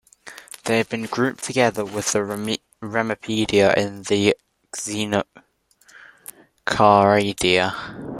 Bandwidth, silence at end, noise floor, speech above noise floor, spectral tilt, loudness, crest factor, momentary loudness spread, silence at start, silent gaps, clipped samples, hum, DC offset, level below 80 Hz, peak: 16 kHz; 0 s; -56 dBFS; 36 dB; -4 dB/octave; -21 LUFS; 20 dB; 21 LU; 0.25 s; none; under 0.1%; none; under 0.1%; -54 dBFS; -2 dBFS